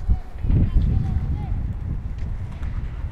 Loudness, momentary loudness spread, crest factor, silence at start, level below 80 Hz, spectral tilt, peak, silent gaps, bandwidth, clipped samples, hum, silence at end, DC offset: -26 LUFS; 10 LU; 16 dB; 0 s; -24 dBFS; -9.5 dB/octave; -6 dBFS; none; 4.9 kHz; under 0.1%; none; 0 s; under 0.1%